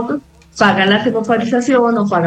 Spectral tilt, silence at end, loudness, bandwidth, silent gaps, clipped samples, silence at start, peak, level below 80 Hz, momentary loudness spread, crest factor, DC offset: -5.5 dB/octave; 0 s; -14 LUFS; 9.4 kHz; none; under 0.1%; 0 s; 0 dBFS; -52 dBFS; 11 LU; 14 dB; under 0.1%